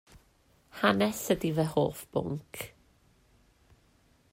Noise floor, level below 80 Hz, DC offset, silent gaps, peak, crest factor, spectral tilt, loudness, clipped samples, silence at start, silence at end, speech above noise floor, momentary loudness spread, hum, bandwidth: -66 dBFS; -60 dBFS; under 0.1%; none; -12 dBFS; 22 dB; -5.5 dB/octave; -30 LUFS; under 0.1%; 0.15 s; 1.65 s; 36 dB; 16 LU; none; 16 kHz